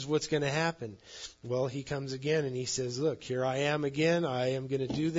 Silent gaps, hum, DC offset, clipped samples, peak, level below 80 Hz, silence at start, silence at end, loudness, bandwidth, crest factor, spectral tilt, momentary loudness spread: none; none; under 0.1%; under 0.1%; -16 dBFS; -64 dBFS; 0 s; 0 s; -32 LUFS; 7.8 kHz; 16 dB; -5 dB/octave; 10 LU